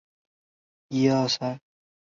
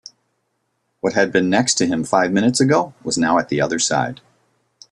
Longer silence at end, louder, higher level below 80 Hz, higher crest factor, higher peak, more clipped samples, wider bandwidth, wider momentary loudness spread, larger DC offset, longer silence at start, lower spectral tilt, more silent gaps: second, 0.6 s vs 0.75 s; second, -25 LUFS vs -18 LUFS; second, -68 dBFS vs -58 dBFS; about the same, 20 dB vs 18 dB; second, -10 dBFS vs -2 dBFS; neither; second, 7.4 kHz vs 12 kHz; first, 12 LU vs 6 LU; neither; second, 0.9 s vs 1.05 s; first, -5.5 dB/octave vs -4 dB/octave; neither